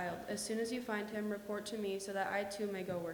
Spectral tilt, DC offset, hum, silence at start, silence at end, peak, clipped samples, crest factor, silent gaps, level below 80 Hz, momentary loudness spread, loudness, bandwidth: -4 dB/octave; under 0.1%; none; 0 s; 0 s; -24 dBFS; under 0.1%; 16 dB; none; -72 dBFS; 3 LU; -40 LUFS; over 20 kHz